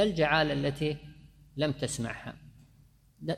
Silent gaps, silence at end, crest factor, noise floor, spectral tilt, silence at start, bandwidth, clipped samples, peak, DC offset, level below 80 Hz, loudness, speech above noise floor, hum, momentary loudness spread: none; 0 s; 22 dB; -61 dBFS; -5 dB/octave; 0 s; 14 kHz; under 0.1%; -10 dBFS; under 0.1%; -54 dBFS; -31 LUFS; 31 dB; none; 19 LU